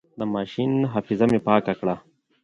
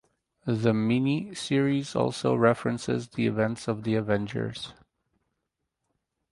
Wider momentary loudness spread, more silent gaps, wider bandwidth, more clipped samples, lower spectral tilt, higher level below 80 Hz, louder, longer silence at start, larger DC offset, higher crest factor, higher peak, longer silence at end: about the same, 8 LU vs 9 LU; neither; about the same, 10.5 kHz vs 11.5 kHz; neither; first, -8.5 dB/octave vs -6.5 dB/octave; about the same, -58 dBFS vs -60 dBFS; first, -23 LUFS vs -27 LUFS; second, 0.15 s vs 0.45 s; neither; about the same, 20 dB vs 20 dB; first, -4 dBFS vs -8 dBFS; second, 0.45 s vs 1.6 s